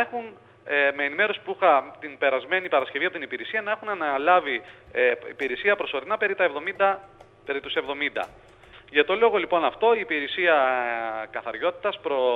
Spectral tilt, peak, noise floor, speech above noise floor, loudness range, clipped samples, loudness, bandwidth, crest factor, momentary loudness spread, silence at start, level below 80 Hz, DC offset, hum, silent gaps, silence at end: -5 dB/octave; -6 dBFS; -50 dBFS; 26 dB; 3 LU; under 0.1%; -24 LUFS; 6.2 kHz; 20 dB; 11 LU; 0 s; -64 dBFS; under 0.1%; none; none; 0 s